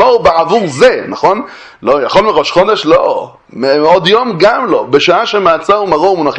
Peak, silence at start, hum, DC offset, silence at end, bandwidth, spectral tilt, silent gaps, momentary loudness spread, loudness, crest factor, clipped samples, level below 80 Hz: 0 dBFS; 0 s; none; under 0.1%; 0 s; 9.2 kHz; -4.5 dB/octave; none; 7 LU; -10 LUFS; 10 dB; 0.7%; -44 dBFS